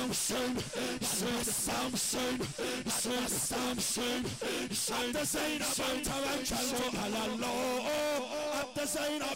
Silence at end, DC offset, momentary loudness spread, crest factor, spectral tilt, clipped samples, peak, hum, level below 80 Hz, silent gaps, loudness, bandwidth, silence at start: 0 s; under 0.1%; 4 LU; 8 dB; -2.5 dB/octave; under 0.1%; -26 dBFS; none; -56 dBFS; none; -33 LUFS; 16 kHz; 0 s